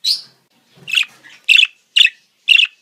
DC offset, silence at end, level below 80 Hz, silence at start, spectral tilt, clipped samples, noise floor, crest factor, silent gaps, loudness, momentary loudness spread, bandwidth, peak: under 0.1%; 0.15 s; -72 dBFS; 0.05 s; 3.5 dB/octave; under 0.1%; -54 dBFS; 16 dB; none; -13 LUFS; 12 LU; 16 kHz; 0 dBFS